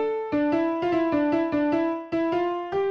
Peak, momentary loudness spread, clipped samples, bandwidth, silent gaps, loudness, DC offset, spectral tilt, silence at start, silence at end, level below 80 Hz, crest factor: -12 dBFS; 4 LU; under 0.1%; 6.4 kHz; none; -25 LUFS; under 0.1%; -7.5 dB/octave; 0 s; 0 s; -58 dBFS; 12 dB